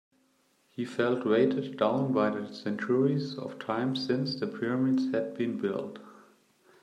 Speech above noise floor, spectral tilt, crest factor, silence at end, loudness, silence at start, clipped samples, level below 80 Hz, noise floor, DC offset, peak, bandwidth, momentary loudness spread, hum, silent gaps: 40 dB; -7.5 dB/octave; 18 dB; 0.7 s; -30 LUFS; 0.8 s; under 0.1%; -78 dBFS; -69 dBFS; under 0.1%; -12 dBFS; 9.4 kHz; 11 LU; none; none